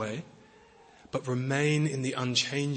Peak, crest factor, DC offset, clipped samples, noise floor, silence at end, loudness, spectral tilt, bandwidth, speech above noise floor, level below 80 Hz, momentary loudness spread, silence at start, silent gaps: -14 dBFS; 18 dB; under 0.1%; under 0.1%; -57 dBFS; 0 s; -29 LUFS; -4.5 dB/octave; 8.8 kHz; 27 dB; -68 dBFS; 10 LU; 0 s; none